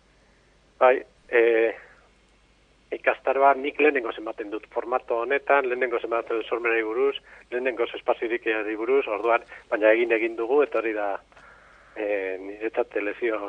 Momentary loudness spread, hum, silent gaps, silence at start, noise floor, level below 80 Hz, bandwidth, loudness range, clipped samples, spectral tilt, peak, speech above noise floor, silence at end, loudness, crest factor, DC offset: 12 LU; none; none; 0.8 s; -60 dBFS; -64 dBFS; 5.8 kHz; 2 LU; under 0.1%; -5 dB/octave; -6 dBFS; 36 dB; 0 s; -24 LUFS; 20 dB; under 0.1%